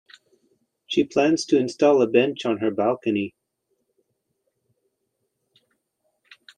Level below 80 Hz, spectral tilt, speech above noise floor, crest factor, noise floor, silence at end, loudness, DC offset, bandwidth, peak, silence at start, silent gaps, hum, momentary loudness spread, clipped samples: -70 dBFS; -5 dB/octave; 56 dB; 20 dB; -76 dBFS; 3.3 s; -21 LUFS; under 0.1%; 10 kHz; -4 dBFS; 0.9 s; none; none; 8 LU; under 0.1%